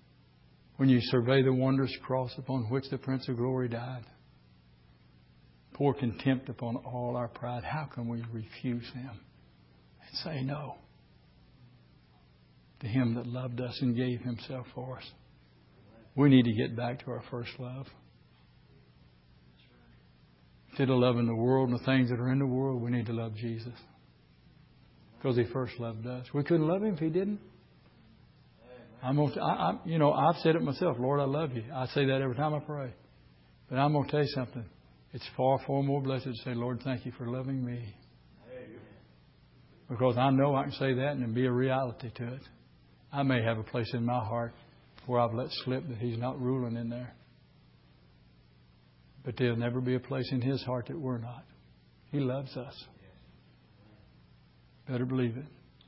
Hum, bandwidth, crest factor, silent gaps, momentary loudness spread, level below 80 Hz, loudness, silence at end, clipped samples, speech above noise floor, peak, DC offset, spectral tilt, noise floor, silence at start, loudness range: none; 5.8 kHz; 22 dB; none; 16 LU; -62 dBFS; -31 LUFS; 0.4 s; under 0.1%; 31 dB; -10 dBFS; under 0.1%; -11 dB/octave; -61 dBFS; 0.8 s; 10 LU